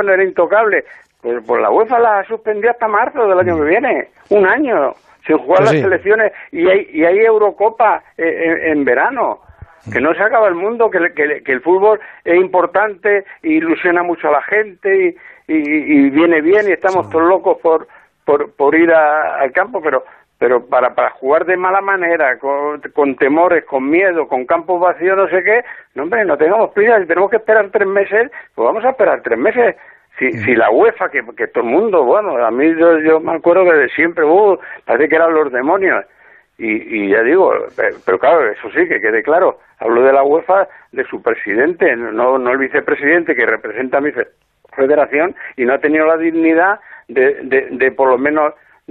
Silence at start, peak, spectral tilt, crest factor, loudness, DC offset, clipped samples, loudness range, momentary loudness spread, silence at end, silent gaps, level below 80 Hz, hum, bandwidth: 0 s; -2 dBFS; -7.5 dB/octave; 12 dB; -13 LUFS; under 0.1%; under 0.1%; 2 LU; 7 LU; 0.35 s; none; -58 dBFS; none; 7.4 kHz